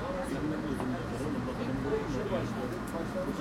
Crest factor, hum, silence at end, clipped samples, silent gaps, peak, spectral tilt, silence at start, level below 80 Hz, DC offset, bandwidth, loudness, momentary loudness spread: 14 dB; none; 0 s; under 0.1%; none; -20 dBFS; -6.5 dB/octave; 0 s; -48 dBFS; under 0.1%; 16.5 kHz; -34 LUFS; 3 LU